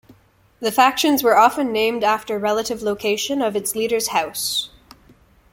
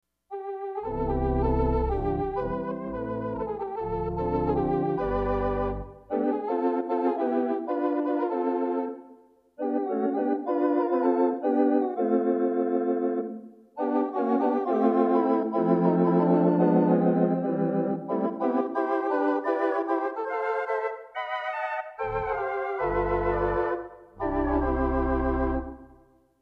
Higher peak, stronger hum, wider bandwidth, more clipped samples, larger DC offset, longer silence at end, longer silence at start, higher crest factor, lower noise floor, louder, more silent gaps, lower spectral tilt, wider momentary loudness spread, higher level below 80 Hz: first, -2 dBFS vs -10 dBFS; neither; first, 17 kHz vs 5.2 kHz; neither; neither; first, 0.85 s vs 0.55 s; second, 0.1 s vs 0.3 s; about the same, 18 dB vs 16 dB; second, -53 dBFS vs -58 dBFS; first, -19 LUFS vs -27 LUFS; neither; second, -2.5 dB/octave vs -10.5 dB/octave; about the same, 8 LU vs 10 LU; second, -56 dBFS vs -40 dBFS